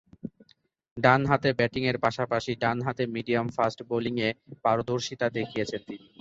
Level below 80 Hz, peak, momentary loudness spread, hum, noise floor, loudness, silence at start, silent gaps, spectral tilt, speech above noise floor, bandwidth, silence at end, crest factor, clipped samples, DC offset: -58 dBFS; -6 dBFS; 13 LU; none; -64 dBFS; -27 LUFS; 0.25 s; 0.91-0.96 s; -6 dB/octave; 37 dB; 7.8 kHz; 0.25 s; 22 dB; under 0.1%; under 0.1%